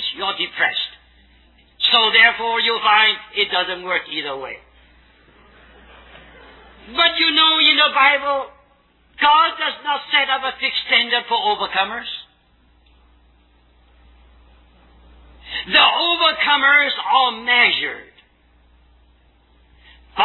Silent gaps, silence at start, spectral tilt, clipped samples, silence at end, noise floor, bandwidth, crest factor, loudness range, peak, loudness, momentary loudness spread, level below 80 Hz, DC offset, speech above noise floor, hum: none; 0 s; -3.5 dB/octave; under 0.1%; 0 s; -56 dBFS; 4.3 kHz; 20 dB; 10 LU; 0 dBFS; -15 LUFS; 16 LU; -54 dBFS; under 0.1%; 39 dB; none